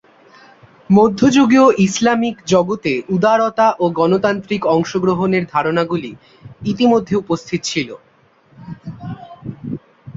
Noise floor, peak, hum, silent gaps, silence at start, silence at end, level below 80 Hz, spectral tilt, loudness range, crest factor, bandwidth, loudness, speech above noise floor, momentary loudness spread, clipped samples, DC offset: -52 dBFS; -2 dBFS; none; none; 0.9 s; 0.05 s; -52 dBFS; -5.5 dB/octave; 7 LU; 14 dB; 7.8 kHz; -15 LUFS; 37 dB; 19 LU; under 0.1%; under 0.1%